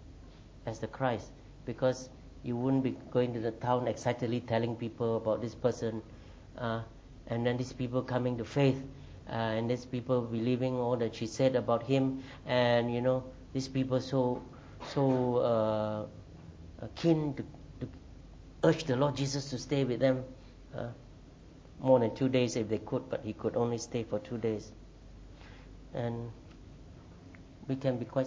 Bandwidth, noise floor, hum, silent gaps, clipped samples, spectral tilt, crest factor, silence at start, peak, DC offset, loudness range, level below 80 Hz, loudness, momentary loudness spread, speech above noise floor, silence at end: 8 kHz; -53 dBFS; none; none; under 0.1%; -6.5 dB/octave; 22 dB; 0 s; -12 dBFS; under 0.1%; 6 LU; -56 dBFS; -32 LUFS; 22 LU; 21 dB; 0 s